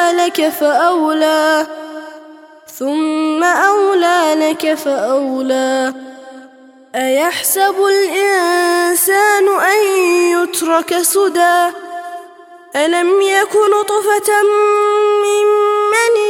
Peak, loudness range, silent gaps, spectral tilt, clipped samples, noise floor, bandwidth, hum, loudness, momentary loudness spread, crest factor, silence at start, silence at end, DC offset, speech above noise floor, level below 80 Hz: 0 dBFS; 4 LU; none; -1 dB/octave; under 0.1%; -42 dBFS; 17 kHz; none; -13 LUFS; 10 LU; 12 dB; 0 s; 0 s; under 0.1%; 29 dB; -68 dBFS